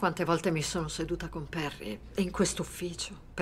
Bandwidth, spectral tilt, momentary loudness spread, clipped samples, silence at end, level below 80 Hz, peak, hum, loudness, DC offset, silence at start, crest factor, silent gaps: 16 kHz; -4.5 dB/octave; 9 LU; under 0.1%; 0 s; -48 dBFS; -12 dBFS; none; -33 LUFS; under 0.1%; 0 s; 20 dB; none